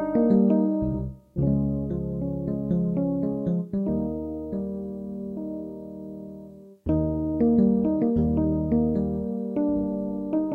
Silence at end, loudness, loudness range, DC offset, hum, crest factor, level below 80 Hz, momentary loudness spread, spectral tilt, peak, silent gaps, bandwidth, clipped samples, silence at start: 0 s; -26 LUFS; 7 LU; under 0.1%; none; 16 dB; -42 dBFS; 14 LU; -12.5 dB/octave; -10 dBFS; none; 2.8 kHz; under 0.1%; 0 s